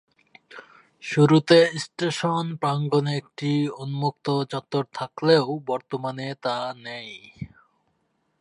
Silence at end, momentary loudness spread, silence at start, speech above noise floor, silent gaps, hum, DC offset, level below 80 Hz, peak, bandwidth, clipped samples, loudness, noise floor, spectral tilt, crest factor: 0.95 s; 18 LU; 0.5 s; 48 dB; none; none; under 0.1%; -66 dBFS; -2 dBFS; 11 kHz; under 0.1%; -23 LUFS; -71 dBFS; -6 dB/octave; 22 dB